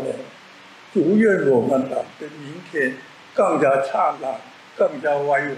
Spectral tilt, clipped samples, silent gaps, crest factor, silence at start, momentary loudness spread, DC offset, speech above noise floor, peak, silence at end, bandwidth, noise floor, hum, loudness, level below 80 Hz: -6.5 dB/octave; under 0.1%; none; 14 dB; 0 s; 18 LU; under 0.1%; 25 dB; -6 dBFS; 0 s; 12 kHz; -45 dBFS; none; -20 LUFS; -76 dBFS